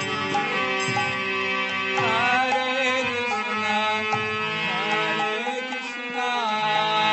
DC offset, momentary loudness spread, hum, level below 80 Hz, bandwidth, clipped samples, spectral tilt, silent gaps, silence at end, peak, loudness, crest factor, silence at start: under 0.1%; 5 LU; none; -68 dBFS; 8.4 kHz; under 0.1%; -3 dB/octave; none; 0 s; -8 dBFS; -23 LUFS; 16 dB; 0 s